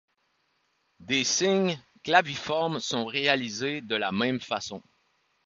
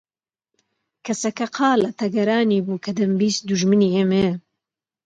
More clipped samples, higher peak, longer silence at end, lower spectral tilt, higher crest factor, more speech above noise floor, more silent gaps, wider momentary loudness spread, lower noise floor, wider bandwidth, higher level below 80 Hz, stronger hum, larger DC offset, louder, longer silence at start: neither; about the same, -4 dBFS vs -6 dBFS; about the same, 0.65 s vs 0.65 s; second, -3 dB/octave vs -5.5 dB/octave; first, 24 dB vs 14 dB; second, 45 dB vs 66 dB; neither; about the same, 9 LU vs 8 LU; second, -73 dBFS vs -86 dBFS; second, 7.8 kHz vs 9.2 kHz; second, -68 dBFS vs -58 dBFS; neither; neither; second, -27 LUFS vs -20 LUFS; about the same, 1 s vs 1.05 s